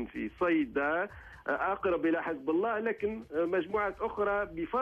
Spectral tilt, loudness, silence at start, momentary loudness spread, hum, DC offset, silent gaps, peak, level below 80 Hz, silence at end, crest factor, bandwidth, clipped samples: -7.5 dB/octave; -32 LUFS; 0 s; 6 LU; none; under 0.1%; none; -18 dBFS; -58 dBFS; 0 s; 12 dB; 5.6 kHz; under 0.1%